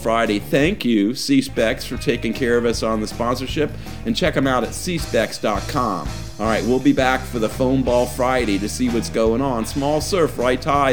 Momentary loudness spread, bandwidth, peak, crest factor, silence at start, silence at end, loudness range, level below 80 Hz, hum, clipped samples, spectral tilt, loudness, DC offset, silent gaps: 6 LU; over 20 kHz; -2 dBFS; 18 dB; 0 s; 0 s; 2 LU; -36 dBFS; none; under 0.1%; -5 dB/octave; -20 LUFS; 1%; none